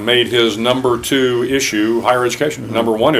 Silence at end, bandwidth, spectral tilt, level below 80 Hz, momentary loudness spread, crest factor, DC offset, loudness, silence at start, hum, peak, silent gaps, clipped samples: 0 s; 16 kHz; -4 dB/octave; -48 dBFS; 4 LU; 14 dB; under 0.1%; -15 LUFS; 0 s; none; 0 dBFS; none; under 0.1%